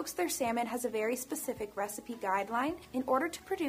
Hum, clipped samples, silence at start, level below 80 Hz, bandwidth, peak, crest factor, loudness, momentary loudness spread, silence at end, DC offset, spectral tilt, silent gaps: none; under 0.1%; 0 s; -66 dBFS; 15.5 kHz; -16 dBFS; 18 dB; -34 LUFS; 6 LU; 0 s; under 0.1%; -3 dB/octave; none